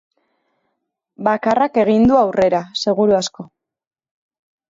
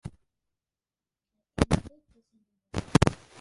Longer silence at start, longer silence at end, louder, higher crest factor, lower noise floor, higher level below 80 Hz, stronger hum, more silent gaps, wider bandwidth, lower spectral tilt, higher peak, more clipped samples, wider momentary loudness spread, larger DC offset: first, 1.2 s vs 0.05 s; first, 1.25 s vs 0.25 s; first, -16 LUFS vs -28 LUFS; second, 14 dB vs 28 dB; second, -74 dBFS vs under -90 dBFS; second, -48 dBFS vs -42 dBFS; neither; neither; second, 7.8 kHz vs 11.5 kHz; about the same, -5.5 dB/octave vs -6 dB/octave; about the same, -4 dBFS vs -2 dBFS; neither; second, 7 LU vs 16 LU; neither